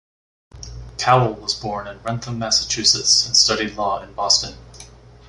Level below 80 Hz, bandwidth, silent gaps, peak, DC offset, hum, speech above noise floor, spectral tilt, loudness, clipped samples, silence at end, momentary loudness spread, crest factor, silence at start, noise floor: -44 dBFS; 11.5 kHz; none; -2 dBFS; under 0.1%; none; 23 dB; -2 dB/octave; -17 LUFS; under 0.1%; 0.4 s; 15 LU; 20 dB; 0.55 s; -43 dBFS